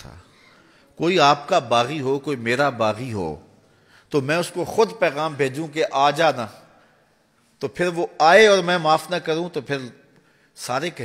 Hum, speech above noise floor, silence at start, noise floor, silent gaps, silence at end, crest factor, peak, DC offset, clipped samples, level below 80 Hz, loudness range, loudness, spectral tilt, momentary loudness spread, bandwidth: none; 41 dB; 0.05 s; -61 dBFS; none; 0 s; 20 dB; -2 dBFS; under 0.1%; under 0.1%; -60 dBFS; 4 LU; -20 LUFS; -4.5 dB/octave; 14 LU; 15.5 kHz